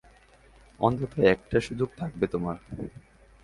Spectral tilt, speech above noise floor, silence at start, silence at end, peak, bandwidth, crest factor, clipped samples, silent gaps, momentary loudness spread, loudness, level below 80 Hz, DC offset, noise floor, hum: -7 dB/octave; 29 dB; 0.8 s; 0.55 s; -8 dBFS; 11.5 kHz; 22 dB; under 0.1%; none; 15 LU; -27 LUFS; -50 dBFS; under 0.1%; -56 dBFS; none